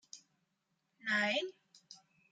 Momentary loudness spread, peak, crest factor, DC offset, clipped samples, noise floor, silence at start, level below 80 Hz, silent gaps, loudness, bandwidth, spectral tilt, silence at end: 25 LU; -22 dBFS; 20 dB; under 0.1%; under 0.1%; -83 dBFS; 0.15 s; under -90 dBFS; none; -35 LUFS; 9.4 kHz; -3 dB/octave; 0.35 s